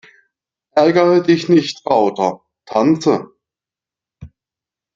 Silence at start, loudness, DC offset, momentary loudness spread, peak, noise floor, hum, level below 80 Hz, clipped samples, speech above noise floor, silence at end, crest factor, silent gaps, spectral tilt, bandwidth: 0.75 s; -15 LUFS; under 0.1%; 9 LU; -2 dBFS; -89 dBFS; none; -58 dBFS; under 0.1%; 75 dB; 0.7 s; 16 dB; none; -6.5 dB/octave; 7.6 kHz